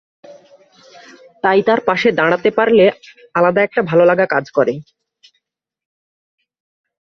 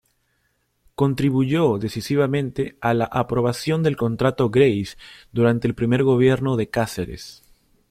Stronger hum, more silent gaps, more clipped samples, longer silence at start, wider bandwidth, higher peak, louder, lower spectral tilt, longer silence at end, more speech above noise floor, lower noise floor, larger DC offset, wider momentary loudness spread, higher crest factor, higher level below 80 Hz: neither; neither; neither; second, 0.3 s vs 1 s; second, 6.4 kHz vs 15.5 kHz; about the same, -2 dBFS vs -4 dBFS; first, -14 LUFS vs -21 LUFS; about the same, -6.5 dB/octave vs -7 dB/octave; first, 2.2 s vs 0.6 s; first, 59 dB vs 48 dB; first, -73 dBFS vs -69 dBFS; neither; second, 7 LU vs 12 LU; about the same, 16 dB vs 18 dB; second, -60 dBFS vs -50 dBFS